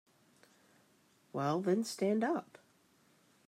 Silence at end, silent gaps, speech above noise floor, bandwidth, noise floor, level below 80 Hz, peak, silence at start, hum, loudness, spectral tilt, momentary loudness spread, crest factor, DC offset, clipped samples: 1.05 s; none; 36 dB; 16 kHz; -70 dBFS; -88 dBFS; -20 dBFS; 1.35 s; none; -35 LUFS; -6 dB/octave; 7 LU; 18 dB; under 0.1%; under 0.1%